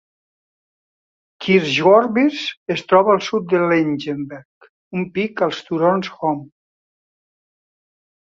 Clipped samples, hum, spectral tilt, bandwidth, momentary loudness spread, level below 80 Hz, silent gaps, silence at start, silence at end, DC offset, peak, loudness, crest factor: under 0.1%; none; -6 dB/octave; 7.8 kHz; 15 LU; -64 dBFS; 2.57-2.66 s, 4.45-4.61 s, 4.69-4.91 s; 1.4 s; 1.85 s; under 0.1%; -2 dBFS; -18 LUFS; 18 dB